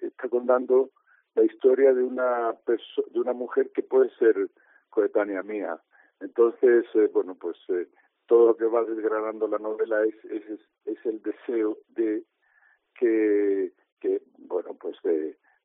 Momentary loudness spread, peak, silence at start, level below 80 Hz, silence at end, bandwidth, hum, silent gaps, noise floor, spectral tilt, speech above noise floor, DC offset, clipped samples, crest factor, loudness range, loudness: 13 LU; -8 dBFS; 0 s; -88 dBFS; 0.3 s; 3.8 kHz; none; 13.92-13.97 s; -64 dBFS; -3.5 dB/octave; 39 dB; under 0.1%; under 0.1%; 18 dB; 5 LU; -25 LUFS